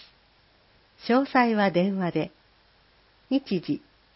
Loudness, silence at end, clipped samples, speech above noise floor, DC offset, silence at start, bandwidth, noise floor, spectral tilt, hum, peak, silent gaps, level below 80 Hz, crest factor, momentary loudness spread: -25 LUFS; 0.4 s; under 0.1%; 37 dB; under 0.1%; 1.05 s; 5.8 kHz; -61 dBFS; -10.5 dB/octave; none; -8 dBFS; none; -66 dBFS; 18 dB; 12 LU